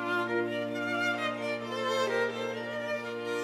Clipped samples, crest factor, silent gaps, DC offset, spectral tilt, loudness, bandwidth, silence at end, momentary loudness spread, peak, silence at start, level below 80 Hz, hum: under 0.1%; 14 dB; none; under 0.1%; -4 dB/octave; -32 LUFS; 16.5 kHz; 0 s; 5 LU; -18 dBFS; 0 s; -78 dBFS; 60 Hz at -75 dBFS